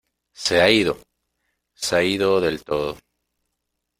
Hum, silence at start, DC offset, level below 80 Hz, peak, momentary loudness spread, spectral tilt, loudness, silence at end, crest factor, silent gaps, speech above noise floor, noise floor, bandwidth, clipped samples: none; 0.4 s; under 0.1%; -52 dBFS; -2 dBFS; 14 LU; -3.5 dB/octave; -20 LUFS; 1.05 s; 22 dB; none; 59 dB; -78 dBFS; 16 kHz; under 0.1%